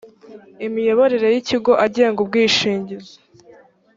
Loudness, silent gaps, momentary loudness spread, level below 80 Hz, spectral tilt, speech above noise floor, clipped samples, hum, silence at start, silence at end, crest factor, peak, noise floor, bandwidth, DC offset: -17 LUFS; none; 12 LU; -60 dBFS; -4 dB/octave; 32 dB; under 0.1%; none; 0.05 s; 0.95 s; 16 dB; -2 dBFS; -48 dBFS; 7.8 kHz; under 0.1%